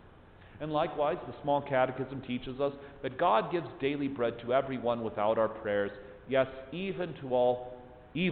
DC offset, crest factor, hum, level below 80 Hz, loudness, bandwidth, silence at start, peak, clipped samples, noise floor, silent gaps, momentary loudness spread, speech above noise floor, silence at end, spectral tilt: under 0.1%; 18 dB; none; -60 dBFS; -32 LUFS; 4.6 kHz; 0.05 s; -14 dBFS; under 0.1%; -54 dBFS; none; 10 LU; 23 dB; 0 s; -10 dB/octave